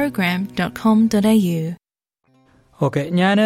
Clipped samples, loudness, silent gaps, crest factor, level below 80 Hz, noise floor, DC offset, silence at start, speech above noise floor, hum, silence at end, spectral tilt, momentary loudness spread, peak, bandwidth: under 0.1%; -18 LUFS; none; 14 dB; -54 dBFS; -70 dBFS; under 0.1%; 0 s; 53 dB; none; 0 s; -6.5 dB/octave; 9 LU; -4 dBFS; 16 kHz